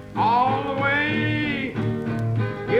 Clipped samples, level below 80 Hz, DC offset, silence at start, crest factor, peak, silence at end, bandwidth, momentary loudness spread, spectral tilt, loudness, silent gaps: under 0.1%; -50 dBFS; under 0.1%; 0 s; 14 dB; -10 dBFS; 0 s; 8 kHz; 6 LU; -7.5 dB/octave; -23 LUFS; none